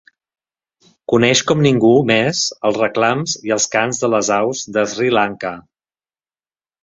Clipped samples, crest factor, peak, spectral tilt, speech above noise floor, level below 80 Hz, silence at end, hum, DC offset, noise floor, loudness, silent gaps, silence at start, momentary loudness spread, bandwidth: under 0.1%; 16 dB; 0 dBFS; -4 dB/octave; over 74 dB; -56 dBFS; 1.25 s; none; under 0.1%; under -90 dBFS; -16 LUFS; none; 1.1 s; 8 LU; 7.8 kHz